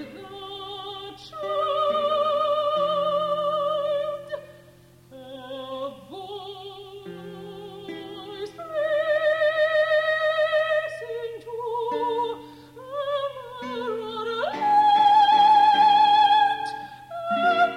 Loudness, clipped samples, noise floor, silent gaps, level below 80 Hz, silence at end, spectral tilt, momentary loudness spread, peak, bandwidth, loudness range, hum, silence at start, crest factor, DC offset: -22 LUFS; under 0.1%; -52 dBFS; none; -66 dBFS; 0 s; -4 dB/octave; 22 LU; -10 dBFS; 12 kHz; 18 LU; none; 0 s; 14 dB; under 0.1%